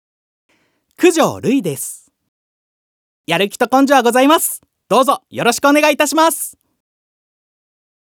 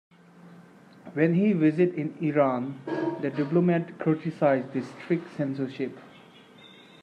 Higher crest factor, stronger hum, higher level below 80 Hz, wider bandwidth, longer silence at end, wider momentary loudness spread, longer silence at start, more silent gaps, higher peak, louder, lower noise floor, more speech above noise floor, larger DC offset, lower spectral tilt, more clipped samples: about the same, 16 dB vs 18 dB; neither; about the same, -70 dBFS vs -74 dBFS; first, over 20 kHz vs 8.4 kHz; first, 1.6 s vs 0.35 s; about the same, 12 LU vs 11 LU; first, 1 s vs 0.45 s; first, 2.28-3.24 s vs none; first, 0 dBFS vs -10 dBFS; first, -14 LUFS vs -27 LUFS; about the same, -51 dBFS vs -52 dBFS; first, 37 dB vs 26 dB; neither; second, -3.5 dB/octave vs -9 dB/octave; neither